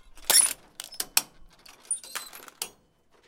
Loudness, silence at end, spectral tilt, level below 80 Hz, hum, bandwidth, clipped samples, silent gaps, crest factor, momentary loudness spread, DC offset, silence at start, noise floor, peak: -24 LUFS; 0.6 s; 2.5 dB/octave; -60 dBFS; none; 17 kHz; under 0.1%; none; 28 dB; 19 LU; under 0.1%; 0.15 s; -63 dBFS; -4 dBFS